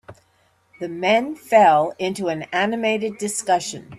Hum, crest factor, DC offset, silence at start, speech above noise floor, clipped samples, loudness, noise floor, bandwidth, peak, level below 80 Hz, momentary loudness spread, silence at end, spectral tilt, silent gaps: none; 18 dB; under 0.1%; 0.1 s; 42 dB; under 0.1%; -20 LUFS; -62 dBFS; 14 kHz; -2 dBFS; -66 dBFS; 11 LU; 0 s; -3.5 dB/octave; none